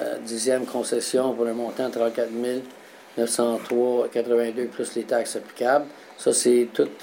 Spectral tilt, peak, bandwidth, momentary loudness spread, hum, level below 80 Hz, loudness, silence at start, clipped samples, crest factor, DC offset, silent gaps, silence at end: -3 dB/octave; -8 dBFS; 16.5 kHz; 8 LU; none; -78 dBFS; -24 LUFS; 0 s; under 0.1%; 16 dB; under 0.1%; none; 0 s